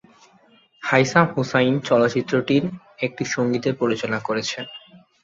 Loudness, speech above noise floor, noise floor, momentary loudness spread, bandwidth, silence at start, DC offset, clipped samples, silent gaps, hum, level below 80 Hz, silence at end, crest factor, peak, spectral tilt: -21 LUFS; 35 dB; -56 dBFS; 12 LU; 7.8 kHz; 0.8 s; under 0.1%; under 0.1%; none; none; -62 dBFS; 0.25 s; 20 dB; -2 dBFS; -5.5 dB/octave